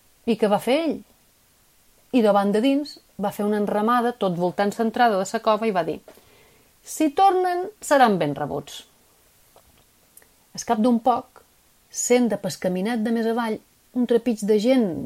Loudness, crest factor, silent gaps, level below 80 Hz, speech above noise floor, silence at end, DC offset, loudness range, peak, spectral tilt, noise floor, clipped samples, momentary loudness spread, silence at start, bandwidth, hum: -22 LUFS; 18 dB; none; -62 dBFS; 38 dB; 0 s; under 0.1%; 4 LU; -4 dBFS; -5 dB/octave; -59 dBFS; under 0.1%; 13 LU; 0.25 s; 16 kHz; none